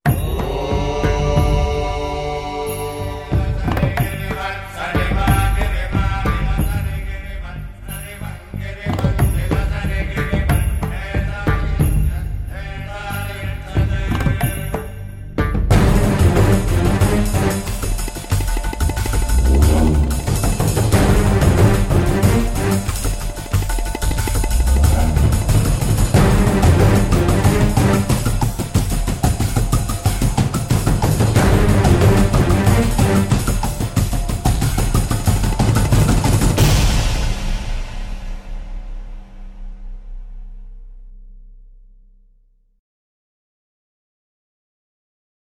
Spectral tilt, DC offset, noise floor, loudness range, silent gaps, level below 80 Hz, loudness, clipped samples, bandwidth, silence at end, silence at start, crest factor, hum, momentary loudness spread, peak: -6 dB/octave; under 0.1%; -55 dBFS; 8 LU; none; -22 dBFS; -18 LUFS; under 0.1%; 16.5 kHz; 3.9 s; 0.05 s; 16 dB; none; 14 LU; -2 dBFS